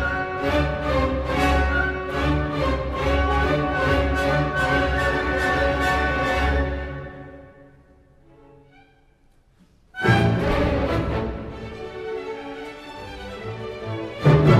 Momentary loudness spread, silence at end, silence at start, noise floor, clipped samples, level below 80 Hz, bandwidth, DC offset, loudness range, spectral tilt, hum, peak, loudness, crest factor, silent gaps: 15 LU; 0 s; 0 s; -57 dBFS; under 0.1%; -30 dBFS; 14 kHz; under 0.1%; 9 LU; -6.5 dB/octave; none; -4 dBFS; -22 LUFS; 20 dB; none